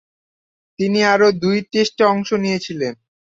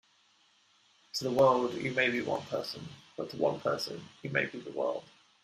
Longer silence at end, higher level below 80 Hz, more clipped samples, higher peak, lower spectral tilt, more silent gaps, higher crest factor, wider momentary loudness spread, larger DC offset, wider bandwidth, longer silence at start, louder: about the same, 0.4 s vs 0.4 s; first, -60 dBFS vs -72 dBFS; neither; first, -2 dBFS vs -12 dBFS; about the same, -5 dB/octave vs -5 dB/octave; neither; about the same, 16 dB vs 20 dB; second, 10 LU vs 16 LU; neither; second, 7.8 kHz vs 14.5 kHz; second, 0.8 s vs 1.15 s; first, -17 LUFS vs -32 LUFS